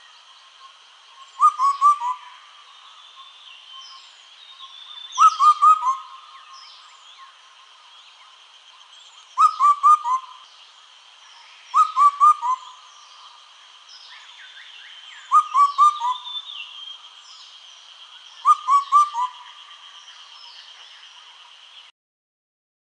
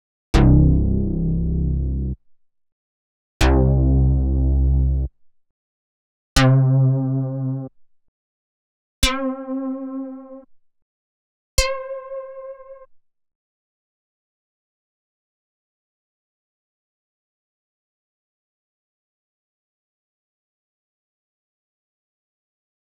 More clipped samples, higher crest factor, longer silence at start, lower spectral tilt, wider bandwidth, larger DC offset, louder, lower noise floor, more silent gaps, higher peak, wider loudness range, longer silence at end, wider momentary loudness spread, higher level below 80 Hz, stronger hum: neither; about the same, 18 dB vs 22 dB; first, 1.4 s vs 0.35 s; second, 4.5 dB/octave vs -6.5 dB/octave; first, 10 kHz vs 4.9 kHz; second, under 0.1% vs 0.2%; about the same, -18 LUFS vs -20 LUFS; about the same, -49 dBFS vs -50 dBFS; second, none vs 2.72-3.40 s, 5.51-6.36 s, 8.08-9.02 s, 10.82-11.58 s; second, -4 dBFS vs 0 dBFS; second, 6 LU vs 10 LU; second, 3.55 s vs 10 s; first, 26 LU vs 18 LU; second, under -90 dBFS vs -26 dBFS; second, none vs 50 Hz at -60 dBFS